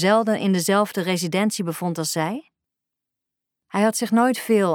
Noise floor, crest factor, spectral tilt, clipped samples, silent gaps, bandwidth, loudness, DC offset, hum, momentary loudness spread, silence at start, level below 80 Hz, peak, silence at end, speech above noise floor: -84 dBFS; 16 dB; -4.5 dB/octave; under 0.1%; none; 19.5 kHz; -21 LUFS; under 0.1%; none; 7 LU; 0 s; -78 dBFS; -4 dBFS; 0 s; 64 dB